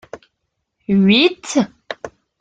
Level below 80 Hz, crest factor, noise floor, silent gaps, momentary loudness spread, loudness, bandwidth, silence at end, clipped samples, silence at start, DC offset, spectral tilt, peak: -56 dBFS; 18 dB; -74 dBFS; none; 21 LU; -15 LUFS; 9.2 kHz; 0.35 s; under 0.1%; 0.15 s; under 0.1%; -5 dB/octave; 0 dBFS